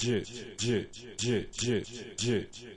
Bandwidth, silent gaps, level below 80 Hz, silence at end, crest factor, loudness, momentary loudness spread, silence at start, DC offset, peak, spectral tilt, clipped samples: 11.5 kHz; none; -56 dBFS; 0 s; 16 dB; -33 LUFS; 8 LU; 0 s; under 0.1%; -18 dBFS; -4.5 dB/octave; under 0.1%